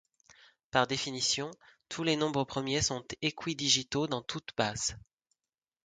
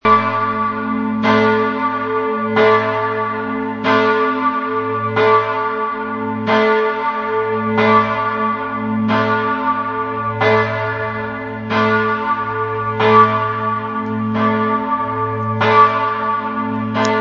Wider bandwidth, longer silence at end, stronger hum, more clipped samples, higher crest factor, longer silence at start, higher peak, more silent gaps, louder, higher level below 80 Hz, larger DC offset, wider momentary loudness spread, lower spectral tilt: first, 10 kHz vs 7.4 kHz; first, 0.85 s vs 0 s; neither; neither; first, 24 dB vs 16 dB; first, 0.75 s vs 0.05 s; second, -10 dBFS vs 0 dBFS; neither; second, -31 LUFS vs -16 LUFS; second, -60 dBFS vs -54 dBFS; neither; about the same, 8 LU vs 8 LU; second, -3 dB/octave vs -6.5 dB/octave